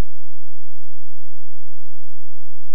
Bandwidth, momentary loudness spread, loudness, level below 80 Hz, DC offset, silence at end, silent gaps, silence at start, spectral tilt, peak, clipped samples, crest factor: 15.5 kHz; 1 LU; -32 LUFS; -62 dBFS; 50%; 0 s; none; 0 s; -8.5 dB/octave; -6 dBFS; under 0.1%; 12 dB